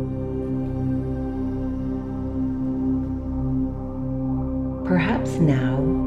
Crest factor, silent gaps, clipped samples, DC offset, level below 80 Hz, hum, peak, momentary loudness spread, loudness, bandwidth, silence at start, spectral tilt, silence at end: 16 dB; none; under 0.1%; 0.2%; -34 dBFS; none; -8 dBFS; 7 LU; -25 LUFS; 8.8 kHz; 0 s; -8.5 dB/octave; 0 s